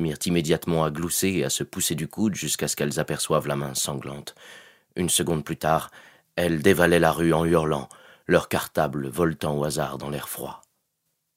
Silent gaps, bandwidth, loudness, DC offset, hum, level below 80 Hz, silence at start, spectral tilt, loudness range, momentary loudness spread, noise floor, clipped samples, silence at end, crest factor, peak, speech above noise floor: none; 16 kHz; -24 LUFS; under 0.1%; none; -50 dBFS; 0 s; -4.5 dB/octave; 4 LU; 13 LU; -76 dBFS; under 0.1%; 0.8 s; 22 dB; -2 dBFS; 52 dB